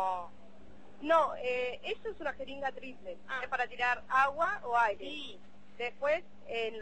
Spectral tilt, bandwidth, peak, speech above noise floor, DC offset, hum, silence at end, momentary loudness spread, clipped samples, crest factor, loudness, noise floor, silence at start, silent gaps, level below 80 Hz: -3.5 dB/octave; 8.4 kHz; -14 dBFS; 23 dB; 0.5%; none; 0 s; 15 LU; under 0.1%; 20 dB; -33 LUFS; -57 dBFS; 0 s; none; -66 dBFS